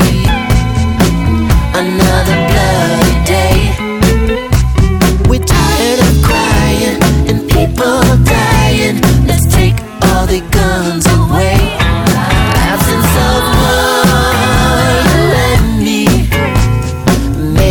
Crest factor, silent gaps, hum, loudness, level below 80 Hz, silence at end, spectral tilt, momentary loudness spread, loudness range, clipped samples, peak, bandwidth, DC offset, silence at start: 10 dB; none; none; -10 LUFS; -16 dBFS; 0 s; -5 dB/octave; 3 LU; 1 LU; under 0.1%; 0 dBFS; 19.5 kHz; under 0.1%; 0 s